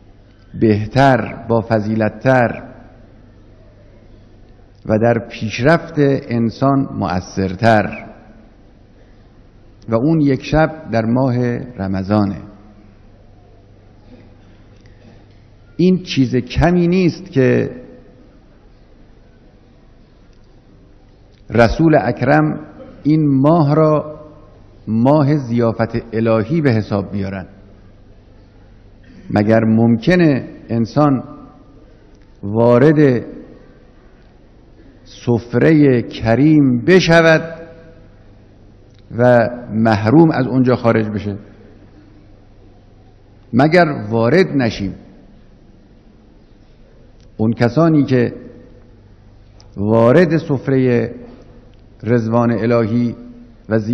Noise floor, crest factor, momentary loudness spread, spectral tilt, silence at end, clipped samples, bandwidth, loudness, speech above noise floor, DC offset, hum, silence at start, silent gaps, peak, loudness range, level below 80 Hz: -45 dBFS; 16 dB; 14 LU; -8 dB/octave; 0 s; 0.1%; 8.2 kHz; -15 LUFS; 32 dB; under 0.1%; none; 0.55 s; none; 0 dBFS; 6 LU; -40 dBFS